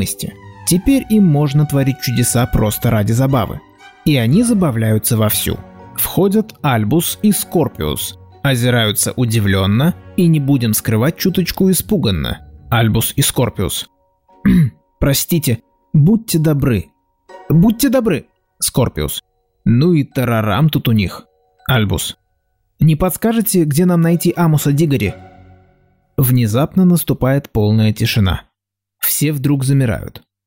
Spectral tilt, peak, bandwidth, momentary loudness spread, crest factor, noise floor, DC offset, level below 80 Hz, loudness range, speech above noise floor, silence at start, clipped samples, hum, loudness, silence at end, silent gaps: -5.5 dB/octave; -2 dBFS; 16.5 kHz; 9 LU; 12 dB; -78 dBFS; 0.2%; -36 dBFS; 2 LU; 64 dB; 0 s; under 0.1%; none; -15 LUFS; 0.3 s; none